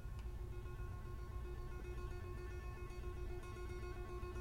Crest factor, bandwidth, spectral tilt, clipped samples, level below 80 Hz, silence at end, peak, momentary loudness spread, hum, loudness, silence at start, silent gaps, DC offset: 14 dB; 16.5 kHz; -7 dB/octave; under 0.1%; -48 dBFS; 0 s; -34 dBFS; 1 LU; none; -50 LUFS; 0 s; none; under 0.1%